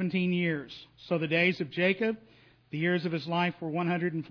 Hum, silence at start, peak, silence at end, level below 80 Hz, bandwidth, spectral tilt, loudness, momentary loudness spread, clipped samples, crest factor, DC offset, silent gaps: none; 0 s; -12 dBFS; 0 s; -72 dBFS; 5.4 kHz; -8 dB/octave; -29 LUFS; 12 LU; under 0.1%; 18 dB; under 0.1%; none